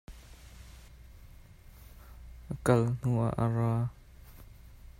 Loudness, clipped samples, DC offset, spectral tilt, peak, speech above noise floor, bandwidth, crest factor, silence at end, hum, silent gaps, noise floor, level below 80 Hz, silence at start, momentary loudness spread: -30 LUFS; under 0.1%; under 0.1%; -8 dB/octave; -10 dBFS; 25 dB; 15.5 kHz; 24 dB; 0.25 s; none; none; -53 dBFS; -52 dBFS; 0.1 s; 26 LU